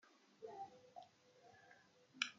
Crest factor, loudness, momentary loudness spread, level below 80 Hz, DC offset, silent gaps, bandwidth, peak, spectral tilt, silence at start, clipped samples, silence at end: 32 dB; -54 LUFS; 15 LU; under -90 dBFS; under 0.1%; none; 7.4 kHz; -22 dBFS; 1.5 dB/octave; 0.05 s; under 0.1%; 0 s